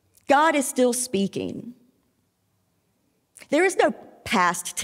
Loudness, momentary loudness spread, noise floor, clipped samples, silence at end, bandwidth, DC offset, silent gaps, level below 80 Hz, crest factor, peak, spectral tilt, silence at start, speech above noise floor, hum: -22 LUFS; 15 LU; -70 dBFS; under 0.1%; 0 s; 16.5 kHz; under 0.1%; none; -66 dBFS; 20 dB; -4 dBFS; -3.5 dB/octave; 0.3 s; 47 dB; none